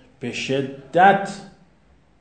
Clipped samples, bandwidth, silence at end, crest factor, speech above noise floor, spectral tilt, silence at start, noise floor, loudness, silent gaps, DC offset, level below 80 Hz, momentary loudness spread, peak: under 0.1%; 9.4 kHz; 0.75 s; 22 dB; 37 dB; -5 dB/octave; 0.2 s; -57 dBFS; -20 LUFS; none; 0.1%; -60 dBFS; 16 LU; 0 dBFS